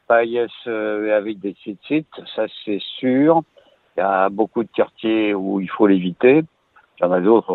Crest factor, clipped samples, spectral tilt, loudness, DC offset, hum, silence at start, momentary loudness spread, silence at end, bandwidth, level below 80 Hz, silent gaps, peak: 18 dB; under 0.1%; -9.5 dB/octave; -19 LUFS; under 0.1%; none; 0.1 s; 12 LU; 0 s; 4.4 kHz; -66 dBFS; none; -2 dBFS